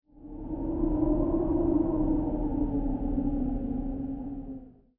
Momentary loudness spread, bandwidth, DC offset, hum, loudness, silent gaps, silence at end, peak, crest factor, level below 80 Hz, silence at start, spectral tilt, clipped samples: 13 LU; 2.9 kHz; under 0.1%; none; -30 LUFS; none; 0.3 s; -14 dBFS; 14 dB; -36 dBFS; 0.2 s; -13.5 dB/octave; under 0.1%